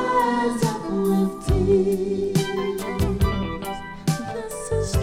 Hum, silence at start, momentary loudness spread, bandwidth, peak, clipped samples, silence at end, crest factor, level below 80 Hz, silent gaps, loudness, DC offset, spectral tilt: none; 0 s; 9 LU; 16 kHz; -8 dBFS; under 0.1%; 0 s; 14 dB; -32 dBFS; none; -23 LUFS; under 0.1%; -6 dB/octave